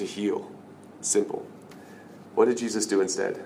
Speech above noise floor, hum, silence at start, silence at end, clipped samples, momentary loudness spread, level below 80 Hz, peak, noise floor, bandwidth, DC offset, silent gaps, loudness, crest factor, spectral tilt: 20 dB; none; 0 s; 0 s; under 0.1%; 23 LU; -76 dBFS; -8 dBFS; -46 dBFS; 16 kHz; under 0.1%; none; -27 LUFS; 20 dB; -3 dB/octave